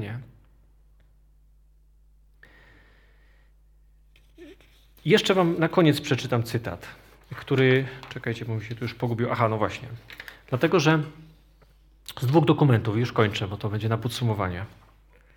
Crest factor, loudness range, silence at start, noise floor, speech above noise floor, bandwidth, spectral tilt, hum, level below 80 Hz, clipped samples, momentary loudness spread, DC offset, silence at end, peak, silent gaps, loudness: 22 dB; 4 LU; 0 s; -57 dBFS; 33 dB; 18 kHz; -6.5 dB/octave; none; -56 dBFS; under 0.1%; 20 LU; under 0.1%; 0.7 s; -4 dBFS; none; -24 LUFS